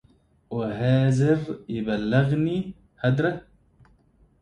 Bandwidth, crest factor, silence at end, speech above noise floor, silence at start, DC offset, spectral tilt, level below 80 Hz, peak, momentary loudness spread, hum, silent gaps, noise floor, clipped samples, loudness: 9.6 kHz; 18 dB; 1 s; 37 dB; 0.5 s; under 0.1%; -8 dB/octave; -54 dBFS; -8 dBFS; 11 LU; none; none; -60 dBFS; under 0.1%; -24 LUFS